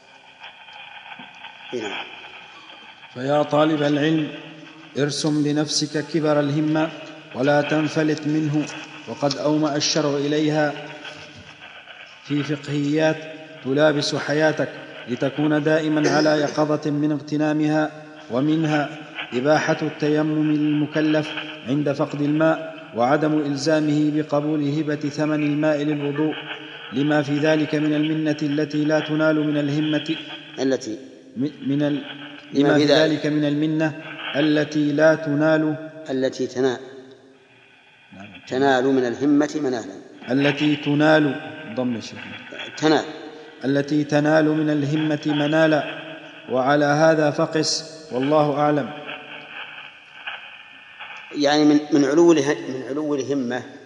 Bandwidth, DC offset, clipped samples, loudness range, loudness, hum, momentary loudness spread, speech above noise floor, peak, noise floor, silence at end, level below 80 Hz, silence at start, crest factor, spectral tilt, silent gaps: 10.5 kHz; under 0.1%; under 0.1%; 4 LU; -21 LUFS; none; 19 LU; 32 dB; -2 dBFS; -52 dBFS; 0 s; -74 dBFS; 0.4 s; 20 dB; -5.5 dB/octave; none